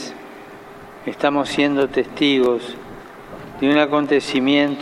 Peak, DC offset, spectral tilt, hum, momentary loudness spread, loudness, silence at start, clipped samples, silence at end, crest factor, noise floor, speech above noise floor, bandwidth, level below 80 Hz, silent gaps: -2 dBFS; under 0.1%; -5 dB/octave; none; 21 LU; -18 LUFS; 0 s; under 0.1%; 0 s; 16 dB; -39 dBFS; 21 dB; 11.5 kHz; -54 dBFS; none